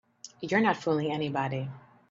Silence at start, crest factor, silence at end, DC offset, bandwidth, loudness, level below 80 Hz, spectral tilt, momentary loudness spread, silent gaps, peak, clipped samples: 0.25 s; 20 dB; 0.3 s; under 0.1%; 7.6 kHz; -29 LUFS; -72 dBFS; -6 dB/octave; 15 LU; none; -12 dBFS; under 0.1%